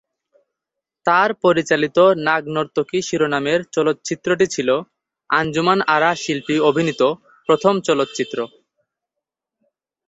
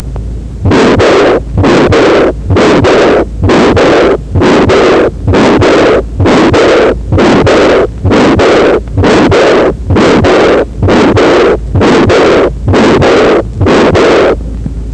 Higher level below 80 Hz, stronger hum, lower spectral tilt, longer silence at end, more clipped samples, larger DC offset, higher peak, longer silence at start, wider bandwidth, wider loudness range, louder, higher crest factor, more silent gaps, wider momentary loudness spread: second, -60 dBFS vs -20 dBFS; neither; second, -4.5 dB/octave vs -6 dB/octave; first, 1.6 s vs 0 s; neither; neither; about the same, -2 dBFS vs 0 dBFS; first, 1.05 s vs 0 s; second, 8.2 kHz vs 9.8 kHz; about the same, 2 LU vs 0 LU; second, -18 LUFS vs -6 LUFS; first, 18 dB vs 6 dB; neither; first, 8 LU vs 4 LU